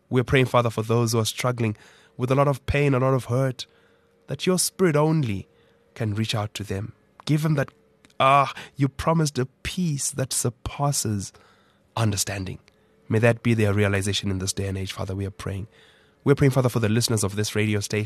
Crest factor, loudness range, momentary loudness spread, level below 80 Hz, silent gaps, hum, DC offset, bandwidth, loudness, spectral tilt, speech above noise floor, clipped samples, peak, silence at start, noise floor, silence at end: 18 dB; 3 LU; 12 LU; -48 dBFS; none; none; under 0.1%; 13 kHz; -24 LUFS; -5 dB/octave; 37 dB; under 0.1%; -4 dBFS; 0.1 s; -60 dBFS; 0 s